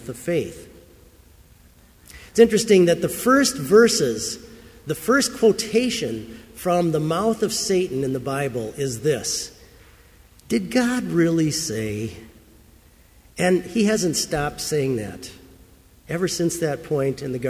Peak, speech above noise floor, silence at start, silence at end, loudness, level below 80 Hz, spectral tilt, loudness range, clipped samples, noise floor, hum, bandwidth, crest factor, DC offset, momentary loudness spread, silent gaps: -2 dBFS; 31 dB; 0 s; 0 s; -21 LUFS; -50 dBFS; -4.5 dB/octave; 6 LU; under 0.1%; -52 dBFS; none; 16 kHz; 20 dB; under 0.1%; 14 LU; none